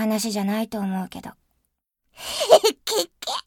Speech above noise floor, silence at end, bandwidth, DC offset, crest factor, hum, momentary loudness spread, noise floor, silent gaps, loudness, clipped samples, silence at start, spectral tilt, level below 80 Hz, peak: 53 dB; 0.05 s; 19 kHz; under 0.1%; 24 dB; none; 19 LU; -75 dBFS; none; -22 LUFS; under 0.1%; 0 s; -3.5 dB/octave; -62 dBFS; 0 dBFS